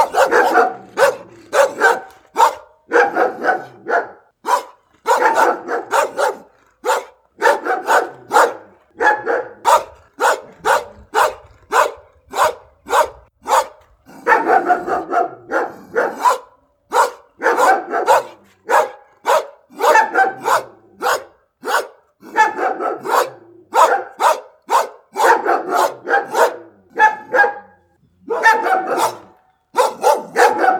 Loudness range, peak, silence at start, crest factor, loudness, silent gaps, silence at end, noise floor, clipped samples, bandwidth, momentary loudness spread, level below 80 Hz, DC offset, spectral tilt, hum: 2 LU; 0 dBFS; 0 s; 18 dB; -17 LUFS; none; 0 s; -55 dBFS; under 0.1%; 19.5 kHz; 10 LU; -60 dBFS; under 0.1%; -2 dB/octave; none